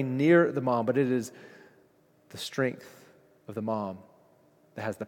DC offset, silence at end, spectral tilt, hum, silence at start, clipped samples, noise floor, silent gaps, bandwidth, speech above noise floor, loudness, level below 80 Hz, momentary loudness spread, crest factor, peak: under 0.1%; 0 s; -6.5 dB/octave; none; 0 s; under 0.1%; -63 dBFS; none; 16.5 kHz; 36 dB; -28 LUFS; -78 dBFS; 24 LU; 20 dB; -10 dBFS